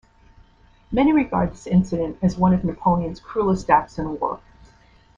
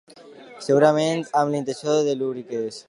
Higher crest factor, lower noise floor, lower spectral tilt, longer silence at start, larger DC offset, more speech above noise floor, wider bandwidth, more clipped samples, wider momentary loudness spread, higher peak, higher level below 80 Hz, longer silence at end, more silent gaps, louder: about the same, 20 dB vs 18 dB; first, -53 dBFS vs -45 dBFS; first, -8 dB/octave vs -5.5 dB/octave; first, 0.9 s vs 0.25 s; neither; first, 33 dB vs 23 dB; second, 7.4 kHz vs 11.5 kHz; neither; about the same, 9 LU vs 11 LU; about the same, -2 dBFS vs -4 dBFS; first, -42 dBFS vs -74 dBFS; first, 0.8 s vs 0.05 s; neither; about the same, -21 LUFS vs -22 LUFS